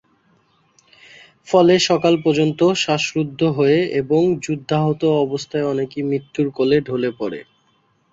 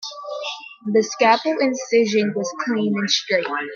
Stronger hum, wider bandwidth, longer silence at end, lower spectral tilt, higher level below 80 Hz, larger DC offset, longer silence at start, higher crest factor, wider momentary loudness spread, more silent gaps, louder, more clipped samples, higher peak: neither; about the same, 7.8 kHz vs 7.2 kHz; first, 0.7 s vs 0 s; first, -5.5 dB/octave vs -3.5 dB/octave; first, -58 dBFS vs -74 dBFS; neither; first, 1.45 s vs 0 s; about the same, 18 dB vs 20 dB; second, 8 LU vs 12 LU; neither; about the same, -18 LUFS vs -20 LUFS; neither; about the same, -2 dBFS vs -2 dBFS